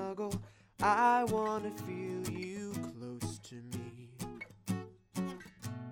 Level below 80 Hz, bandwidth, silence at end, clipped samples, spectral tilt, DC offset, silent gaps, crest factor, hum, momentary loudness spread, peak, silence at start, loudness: -64 dBFS; 19.5 kHz; 0 s; under 0.1%; -5.5 dB/octave; under 0.1%; none; 20 dB; none; 18 LU; -16 dBFS; 0 s; -37 LUFS